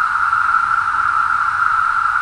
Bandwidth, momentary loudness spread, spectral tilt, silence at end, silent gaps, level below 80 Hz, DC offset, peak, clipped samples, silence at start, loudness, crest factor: 11 kHz; 1 LU; -1.5 dB/octave; 0 s; none; -48 dBFS; under 0.1%; -2 dBFS; under 0.1%; 0 s; -15 LUFS; 14 dB